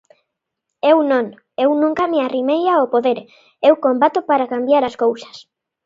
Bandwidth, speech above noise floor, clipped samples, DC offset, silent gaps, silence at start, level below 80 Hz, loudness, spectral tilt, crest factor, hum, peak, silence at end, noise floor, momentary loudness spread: 7.6 kHz; 62 dB; under 0.1%; under 0.1%; none; 0.85 s; -64 dBFS; -17 LUFS; -5.5 dB/octave; 18 dB; none; 0 dBFS; 0.45 s; -79 dBFS; 6 LU